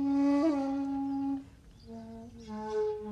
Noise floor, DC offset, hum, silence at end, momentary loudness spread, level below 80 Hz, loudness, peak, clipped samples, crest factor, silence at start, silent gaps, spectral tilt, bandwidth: -52 dBFS; under 0.1%; none; 0 s; 20 LU; -60 dBFS; -32 LUFS; -20 dBFS; under 0.1%; 14 dB; 0 s; none; -7 dB/octave; 7.8 kHz